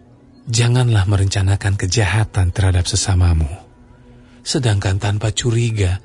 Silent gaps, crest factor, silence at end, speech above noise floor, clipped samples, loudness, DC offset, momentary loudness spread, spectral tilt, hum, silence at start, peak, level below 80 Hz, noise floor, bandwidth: none; 14 dB; 0.05 s; 28 dB; under 0.1%; -17 LUFS; under 0.1%; 6 LU; -5 dB/octave; none; 0.45 s; -2 dBFS; -34 dBFS; -44 dBFS; 11 kHz